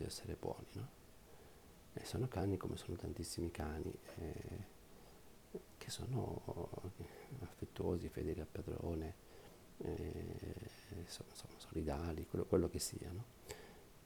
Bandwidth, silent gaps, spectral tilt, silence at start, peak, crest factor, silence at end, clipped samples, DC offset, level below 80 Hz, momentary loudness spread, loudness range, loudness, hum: over 20 kHz; none; -6 dB/octave; 0 s; -22 dBFS; 24 dB; 0 s; under 0.1%; under 0.1%; -58 dBFS; 19 LU; 5 LU; -46 LUFS; none